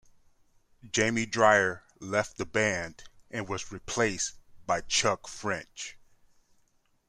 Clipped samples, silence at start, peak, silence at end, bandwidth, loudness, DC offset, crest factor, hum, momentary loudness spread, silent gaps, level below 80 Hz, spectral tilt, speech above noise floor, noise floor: under 0.1%; 0.85 s; -6 dBFS; 1.1 s; 13.5 kHz; -28 LUFS; under 0.1%; 24 dB; none; 17 LU; none; -58 dBFS; -3 dB/octave; 39 dB; -68 dBFS